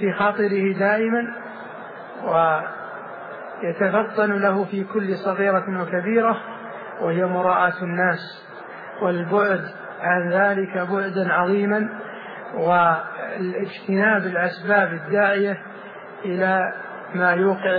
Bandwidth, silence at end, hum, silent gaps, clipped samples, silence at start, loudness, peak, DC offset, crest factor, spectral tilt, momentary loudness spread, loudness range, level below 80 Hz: 5 kHz; 0 s; none; none; under 0.1%; 0 s; -21 LUFS; -6 dBFS; under 0.1%; 16 dB; -9.5 dB/octave; 16 LU; 2 LU; -76 dBFS